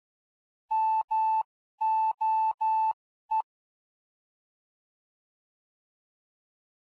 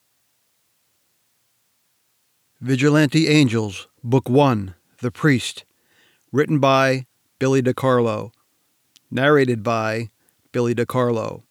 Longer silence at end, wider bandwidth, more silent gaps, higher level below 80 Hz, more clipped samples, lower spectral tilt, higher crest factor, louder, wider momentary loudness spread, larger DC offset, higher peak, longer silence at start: first, 3.4 s vs 0.1 s; second, 4.7 kHz vs 15.5 kHz; first, 1.04-1.08 s, 1.45-1.78 s, 2.54-2.58 s, 2.93-3.29 s vs none; second, -90 dBFS vs -66 dBFS; neither; second, -0.5 dB/octave vs -6 dB/octave; second, 10 dB vs 18 dB; second, -28 LUFS vs -19 LUFS; second, 6 LU vs 14 LU; neither; second, -22 dBFS vs -4 dBFS; second, 0.7 s vs 2.6 s